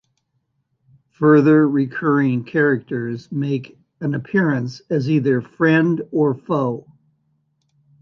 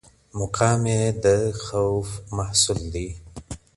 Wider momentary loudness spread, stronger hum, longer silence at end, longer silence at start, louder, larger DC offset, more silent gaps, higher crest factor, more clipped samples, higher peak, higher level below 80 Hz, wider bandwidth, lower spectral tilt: second, 11 LU vs 17 LU; neither; first, 1.2 s vs 0.2 s; first, 1.2 s vs 0.35 s; first, -19 LUFS vs -23 LUFS; neither; neither; about the same, 16 dB vs 20 dB; neither; about the same, -2 dBFS vs -4 dBFS; second, -64 dBFS vs -42 dBFS; second, 6.6 kHz vs 11.5 kHz; first, -9 dB/octave vs -4.5 dB/octave